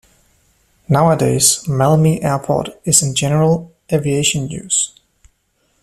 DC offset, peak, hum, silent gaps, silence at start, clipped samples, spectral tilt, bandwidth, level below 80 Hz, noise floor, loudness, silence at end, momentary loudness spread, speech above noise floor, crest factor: under 0.1%; 0 dBFS; none; none; 0.9 s; under 0.1%; -4.5 dB/octave; 14 kHz; -46 dBFS; -63 dBFS; -15 LUFS; 0.95 s; 8 LU; 48 dB; 16 dB